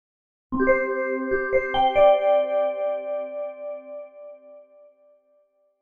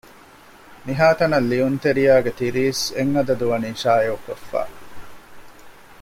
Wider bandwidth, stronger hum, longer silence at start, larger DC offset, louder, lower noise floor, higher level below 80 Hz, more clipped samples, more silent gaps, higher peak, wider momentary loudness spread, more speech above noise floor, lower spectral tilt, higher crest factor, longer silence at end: second, 3.7 kHz vs 16.5 kHz; neither; second, 0.5 s vs 0.7 s; neither; about the same, -22 LUFS vs -20 LUFS; first, -64 dBFS vs -46 dBFS; about the same, -48 dBFS vs -52 dBFS; neither; neither; about the same, -6 dBFS vs -4 dBFS; first, 22 LU vs 12 LU; first, 45 dB vs 27 dB; about the same, -6.5 dB/octave vs -5.5 dB/octave; about the same, 18 dB vs 18 dB; first, 1.2 s vs 0.05 s